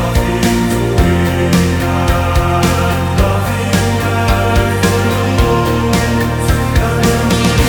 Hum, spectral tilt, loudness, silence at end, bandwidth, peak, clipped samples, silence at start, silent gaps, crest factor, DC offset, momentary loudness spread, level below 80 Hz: none; -5.5 dB/octave; -13 LUFS; 0 s; over 20 kHz; 0 dBFS; under 0.1%; 0 s; none; 12 dB; under 0.1%; 2 LU; -20 dBFS